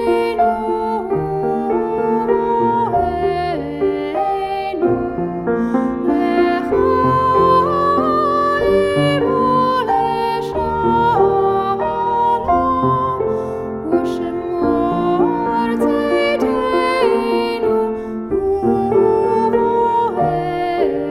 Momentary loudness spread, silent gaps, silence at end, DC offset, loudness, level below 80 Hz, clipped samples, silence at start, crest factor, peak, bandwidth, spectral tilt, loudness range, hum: 6 LU; none; 0 s; under 0.1%; -17 LUFS; -42 dBFS; under 0.1%; 0 s; 14 dB; -2 dBFS; 12.5 kHz; -7.5 dB/octave; 3 LU; none